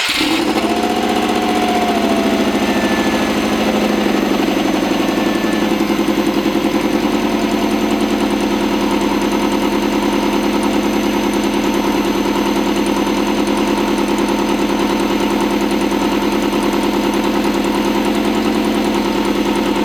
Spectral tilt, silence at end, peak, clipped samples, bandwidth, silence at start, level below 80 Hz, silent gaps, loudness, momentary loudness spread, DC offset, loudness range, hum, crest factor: -4.5 dB/octave; 0 s; -2 dBFS; under 0.1%; 19.5 kHz; 0 s; -38 dBFS; none; -16 LUFS; 1 LU; under 0.1%; 1 LU; none; 14 dB